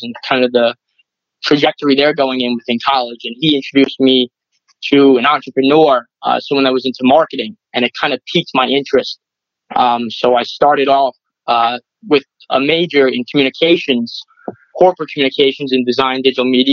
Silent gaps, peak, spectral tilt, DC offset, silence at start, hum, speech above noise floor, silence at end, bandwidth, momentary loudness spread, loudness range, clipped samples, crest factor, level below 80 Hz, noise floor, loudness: none; 0 dBFS; -5.5 dB/octave; under 0.1%; 0 s; none; 48 dB; 0 s; 6.8 kHz; 10 LU; 2 LU; under 0.1%; 14 dB; -60 dBFS; -61 dBFS; -13 LUFS